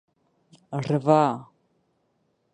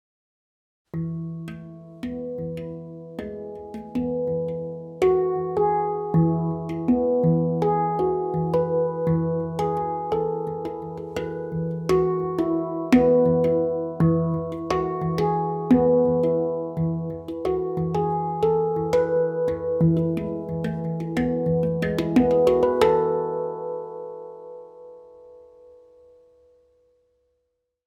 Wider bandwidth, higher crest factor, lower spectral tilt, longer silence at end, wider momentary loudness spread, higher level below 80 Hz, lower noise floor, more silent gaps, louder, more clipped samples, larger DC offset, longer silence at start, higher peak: second, 10 kHz vs 11.5 kHz; about the same, 22 dB vs 18 dB; about the same, -8 dB/octave vs -8.5 dB/octave; second, 1.1 s vs 2.45 s; about the same, 15 LU vs 15 LU; second, -70 dBFS vs -52 dBFS; second, -71 dBFS vs -76 dBFS; neither; about the same, -23 LUFS vs -23 LUFS; neither; neither; second, 0.7 s vs 0.95 s; about the same, -4 dBFS vs -6 dBFS